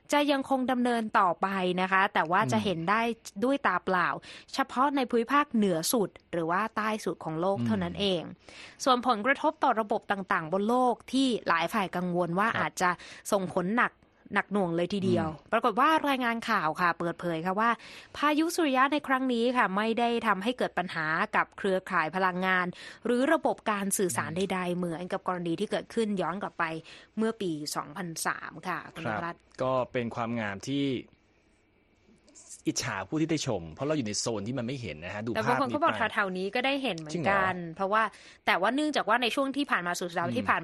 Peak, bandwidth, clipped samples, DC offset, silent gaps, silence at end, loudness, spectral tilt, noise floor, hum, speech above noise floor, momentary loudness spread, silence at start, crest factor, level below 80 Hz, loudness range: -8 dBFS; 13 kHz; under 0.1%; under 0.1%; none; 0 s; -29 LUFS; -4.5 dB/octave; -66 dBFS; none; 37 dB; 8 LU; 0.1 s; 20 dB; -64 dBFS; 6 LU